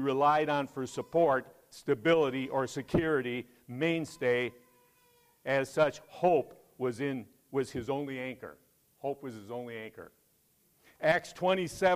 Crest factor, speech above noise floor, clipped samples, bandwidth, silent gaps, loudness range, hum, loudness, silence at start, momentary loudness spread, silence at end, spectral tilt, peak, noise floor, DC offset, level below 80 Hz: 18 dB; 39 dB; under 0.1%; 15.5 kHz; none; 8 LU; none; -32 LUFS; 0 s; 15 LU; 0 s; -5.5 dB/octave; -14 dBFS; -70 dBFS; under 0.1%; -62 dBFS